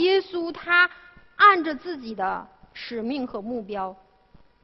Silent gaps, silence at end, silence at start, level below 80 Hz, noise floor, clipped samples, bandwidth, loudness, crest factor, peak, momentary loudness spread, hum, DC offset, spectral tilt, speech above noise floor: none; 0.7 s; 0 s; -62 dBFS; -55 dBFS; under 0.1%; 6 kHz; -23 LUFS; 20 dB; -4 dBFS; 18 LU; none; under 0.1%; -6 dB/octave; 29 dB